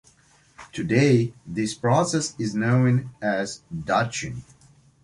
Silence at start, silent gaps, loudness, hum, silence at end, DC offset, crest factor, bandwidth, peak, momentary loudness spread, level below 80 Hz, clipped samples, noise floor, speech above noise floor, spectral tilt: 0.6 s; none; -23 LUFS; none; 0.65 s; under 0.1%; 18 dB; 11.5 kHz; -6 dBFS; 13 LU; -56 dBFS; under 0.1%; -58 dBFS; 35 dB; -6 dB/octave